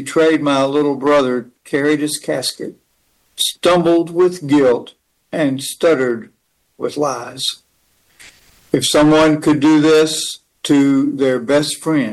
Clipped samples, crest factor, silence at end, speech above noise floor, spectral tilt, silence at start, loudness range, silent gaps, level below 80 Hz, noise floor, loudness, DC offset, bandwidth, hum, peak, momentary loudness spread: under 0.1%; 16 dB; 0 s; 47 dB; -4.5 dB/octave; 0 s; 7 LU; none; -52 dBFS; -61 dBFS; -15 LUFS; under 0.1%; 12.5 kHz; none; 0 dBFS; 11 LU